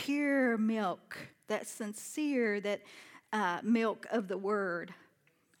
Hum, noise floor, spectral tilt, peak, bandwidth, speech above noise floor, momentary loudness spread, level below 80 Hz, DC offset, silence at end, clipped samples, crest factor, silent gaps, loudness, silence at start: none; -71 dBFS; -5 dB/octave; -18 dBFS; 18 kHz; 38 dB; 14 LU; under -90 dBFS; under 0.1%; 0.65 s; under 0.1%; 16 dB; none; -34 LUFS; 0 s